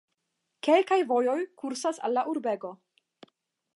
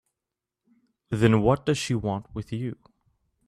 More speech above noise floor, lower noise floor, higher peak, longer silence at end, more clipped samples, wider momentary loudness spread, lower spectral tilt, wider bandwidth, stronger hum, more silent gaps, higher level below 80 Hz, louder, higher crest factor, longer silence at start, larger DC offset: second, 54 dB vs 63 dB; second, -81 dBFS vs -87 dBFS; about the same, -10 dBFS vs -8 dBFS; first, 1 s vs 0.75 s; neither; second, 11 LU vs 14 LU; second, -3.5 dB/octave vs -6.5 dB/octave; second, 11.5 kHz vs 13 kHz; neither; neither; second, -88 dBFS vs -50 dBFS; about the same, -27 LUFS vs -26 LUFS; about the same, 20 dB vs 20 dB; second, 0.65 s vs 1.1 s; neither